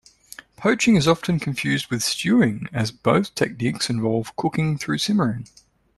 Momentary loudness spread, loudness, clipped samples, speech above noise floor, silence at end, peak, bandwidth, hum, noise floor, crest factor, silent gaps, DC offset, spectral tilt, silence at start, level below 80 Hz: 8 LU; -21 LUFS; under 0.1%; 24 dB; 0.5 s; -4 dBFS; 13 kHz; none; -45 dBFS; 18 dB; none; under 0.1%; -5 dB/octave; 0.6 s; -52 dBFS